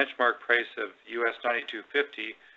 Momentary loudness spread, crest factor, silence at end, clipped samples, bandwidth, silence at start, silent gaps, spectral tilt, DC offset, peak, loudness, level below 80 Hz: 10 LU; 20 dB; 0.25 s; under 0.1%; 7.6 kHz; 0 s; none; -3.5 dB/octave; under 0.1%; -10 dBFS; -29 LUFS; -78 dBFS